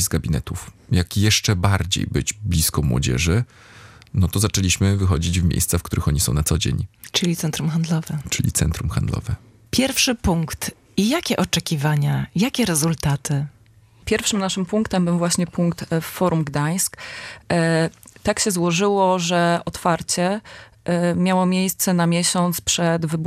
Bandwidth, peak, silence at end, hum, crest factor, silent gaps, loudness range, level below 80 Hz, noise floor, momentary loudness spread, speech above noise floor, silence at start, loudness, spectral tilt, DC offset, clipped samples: 15.5 kHz; -2 dBFS; 0 s; none; 18 dB; none; 2 LU; -38 dBFS; -51 dBFS; 7 LU; 31 dB; 0 s; -20 LUFS; -4.5 dB/octave; under 0.1%; under 0.1%